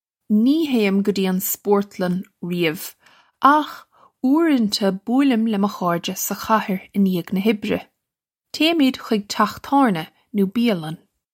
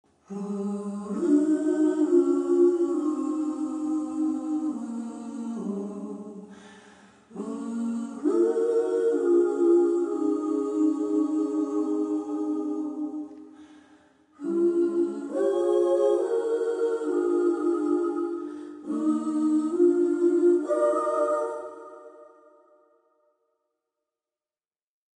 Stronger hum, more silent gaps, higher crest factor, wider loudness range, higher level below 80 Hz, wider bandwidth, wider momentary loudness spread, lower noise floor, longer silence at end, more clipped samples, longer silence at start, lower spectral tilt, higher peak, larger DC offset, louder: neither; neither; about the same, 20 dB vs 16 dB; second, 2 LU vs 8 LU; first, -64 dBFS vs -80 dBFS; first, 16.5 kHz vs 9.8 kHz; second, 10 LU vs 14 LU; second, -84 dBFS vs under -90 dBFS; second, 0.35 s vs 2.95 s; neither; about the same, 0.3 s vs 0.3 s; second, -5 dB/octave vs -7 dB/octave; first, 0 dBFS vs -10 dBFS; neither; first, -20 LUFS vs -26 LUFS